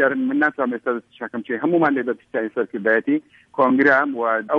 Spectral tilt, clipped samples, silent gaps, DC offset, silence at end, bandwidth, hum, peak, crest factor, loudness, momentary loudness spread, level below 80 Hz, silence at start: -8 dB/octave; under 0.1%; none; under 0.1%; 0 s; 5.8 kHz; none; -4 dBFS; 16 dB; -20 LUFS; 11 LU; -68 dBFS; 0 s